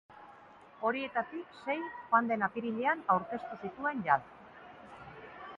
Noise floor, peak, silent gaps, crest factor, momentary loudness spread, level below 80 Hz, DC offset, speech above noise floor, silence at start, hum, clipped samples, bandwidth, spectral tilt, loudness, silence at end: -56 dBFS; -12 dBFS; none; 22 dB; 23 LU; -72 dBFS; under 0.1%; 23 dB; 0.1 s; none; under 0.1%; 7.6 kHz; -7.5 dB/octave; -33 LUFS; 0 s